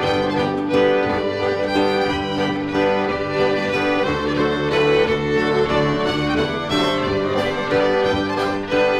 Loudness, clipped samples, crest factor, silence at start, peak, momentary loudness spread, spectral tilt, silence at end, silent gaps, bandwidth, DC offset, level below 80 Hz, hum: -19 LUFS; under 0.1%; 14 dB; 0 s; -6 dBFS; 4 LU; -6 dB/octave; 0 s; none; 12.5 kHz; under 0.1%; -42 dBFS; none